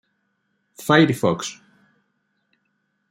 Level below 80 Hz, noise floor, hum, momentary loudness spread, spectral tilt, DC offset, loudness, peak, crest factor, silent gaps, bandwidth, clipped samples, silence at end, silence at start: -64 dBFS; -72 dBFS; none; 16 LU; -5.5 dB/octave; under 0.1%; -19 LUFS; -2 dBFS; 22 dB; none; 16 kHz; under 0.1%; 1.6 s; 0.8 s